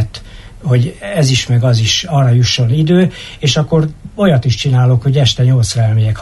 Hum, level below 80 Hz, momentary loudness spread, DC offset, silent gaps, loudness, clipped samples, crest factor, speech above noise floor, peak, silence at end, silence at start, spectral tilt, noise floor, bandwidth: none; -36 dBFS; 6 LU; under 0.1%; none; -12 LUFS; under 0.1%; 12 dB; 20 dB; 0 dBFS; 0 s; 0 s; -5.5 dB/octave; -31 dBFS; 12 kHz